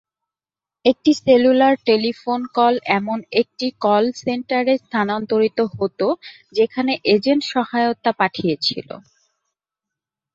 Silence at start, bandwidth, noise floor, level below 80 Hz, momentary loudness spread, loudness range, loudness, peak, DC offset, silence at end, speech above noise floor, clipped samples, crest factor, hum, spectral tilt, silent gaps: 0.85 s; 7.8 kHz; under -90 dBFS; -62 dBFS; 8 LU; 3 LU; -19 LUFS; 0 dBFS; under 0.1%; 1.35 s; over 72 dB; under 0.1%; 18 dB; none; -5.5 dB/octave; none